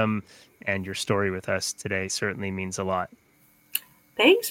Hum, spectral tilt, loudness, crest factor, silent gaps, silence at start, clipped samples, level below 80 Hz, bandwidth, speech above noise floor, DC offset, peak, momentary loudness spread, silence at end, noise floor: none; -4 dB/octave; -27 LUFS; 22 dB; none; 0 s; under 0.1%; -66 dBFS; 17 kHz; 35 dB; under 0.1%; -4 dBFS; 11 LU; 0 s; -61 dBFS